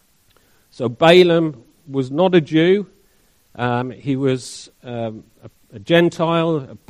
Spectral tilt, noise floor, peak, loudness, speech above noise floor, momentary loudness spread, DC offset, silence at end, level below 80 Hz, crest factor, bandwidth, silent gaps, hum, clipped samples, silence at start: -6.5 dB/octave; -58 dBFS; 0 dBFS; -17 LUFS; 41 dB; 18 LU; under 0.1%; 0.15 s; -58 dBFS; 18 dB; 12.5 kHz; none; none; under 0.1%; 0.8 s